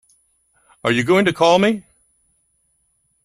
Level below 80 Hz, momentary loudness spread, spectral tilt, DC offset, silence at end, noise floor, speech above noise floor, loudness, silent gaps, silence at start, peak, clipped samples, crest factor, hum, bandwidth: -58 dBFS; 10 LU; -5 dB/octave; under 0.1%; 1.45 s; -66 dBFS; 50 dB; -17 LUFS; none; 0.85 s; -2 dBFS; under 0.1%; 18 dB; none; 13.5 kHz